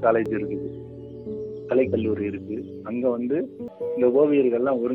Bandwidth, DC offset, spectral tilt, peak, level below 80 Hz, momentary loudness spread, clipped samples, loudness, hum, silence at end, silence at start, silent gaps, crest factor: 4.2 kHz; under 0.1%; -10 dB/octave; -8 dBFS; -58 dBFS; 15 LU; under 0.1%; -24 LUFS; none; 0 s; 0 s; none; 16 dB